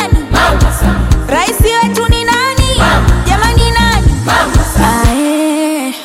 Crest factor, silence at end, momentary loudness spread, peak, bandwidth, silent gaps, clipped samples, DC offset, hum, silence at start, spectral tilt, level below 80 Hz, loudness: 10 dB; 0 s; 3 LU; 0 dBFS; 16.5 kHz; none; under 0.1%; under 0.1%; none; 0 s; -4.5 dB/octave; -14 dBFS; -10 LUFS